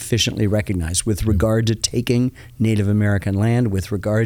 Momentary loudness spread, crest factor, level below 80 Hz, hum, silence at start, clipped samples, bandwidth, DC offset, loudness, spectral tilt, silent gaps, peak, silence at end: 4 LU; 16 dB; -38 dBFS; none; 0 s; under 0.1%; 16 kHz; under 0.1%; -19 LUFS; -5.5 dB/octave; none; -4 dBFS; 0 s